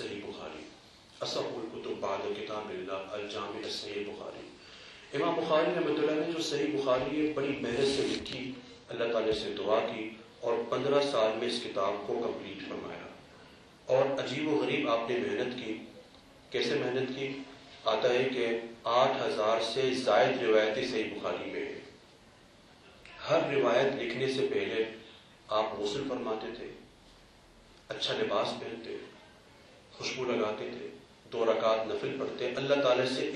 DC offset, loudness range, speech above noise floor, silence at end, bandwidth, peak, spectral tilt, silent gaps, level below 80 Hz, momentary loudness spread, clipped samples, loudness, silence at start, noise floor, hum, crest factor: under 0.1%; 8 LU; 27 dB; 0 s; 11.5 kHz; -14 dBFS; -4.5 dB/octave; none; -66 dBFS; 16 LU; under 0.1%; -32 LUFS; 0 s; -58 dBFS; none; 20 dB